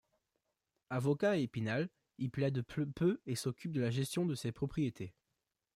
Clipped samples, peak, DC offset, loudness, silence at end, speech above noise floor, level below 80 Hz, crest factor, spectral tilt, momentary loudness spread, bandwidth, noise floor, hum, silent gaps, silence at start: under 0.1%; -22 dBFS; under 0.1%; -37 LUFS; 0.65 s; 51 dB; -66 dBFS; 16 dB; -6.5 dB/octave; 9 LU; 15.5 kHz; -87 dBFS; none; none; 0.9 s